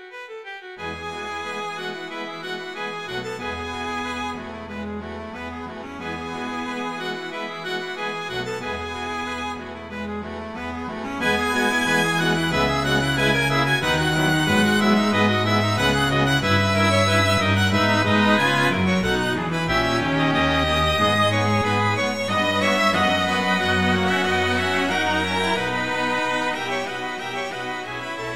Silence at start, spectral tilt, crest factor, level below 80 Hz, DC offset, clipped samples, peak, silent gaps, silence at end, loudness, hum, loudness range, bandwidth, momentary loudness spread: 0 s; -4.5 dB/octave; 16 dB; -44 dBFS; 0.5%; under 0.1%; -6 dBFS; none; 0 s; -21 LUFS; none; 11 LU; 16.5 kHz; 13 LU